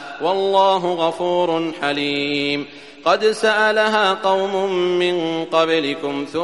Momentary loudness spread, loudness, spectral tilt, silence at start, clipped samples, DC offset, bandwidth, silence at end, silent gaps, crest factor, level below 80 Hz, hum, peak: 7 LU; -18 LUFS; -4.5 dB/octave; 0 s; under 0.1%; 0.2%; 11.5 kHz; 0 s; none; 16 dB; -64 dBFS; none; -2 dBFS